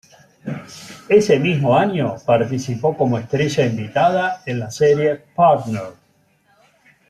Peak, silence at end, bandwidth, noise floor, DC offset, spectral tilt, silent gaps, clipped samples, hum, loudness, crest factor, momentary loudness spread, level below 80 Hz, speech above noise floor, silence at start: -2 dBFS; 1.2 s; 13.5 kHz; -59 dBFS; under 0.1%; -6.5 dB/octave; none; under 0.1%; none; -18 LUFS; 16 dB; 16 LU; -58 dBFS; 42 dB; 0.45 s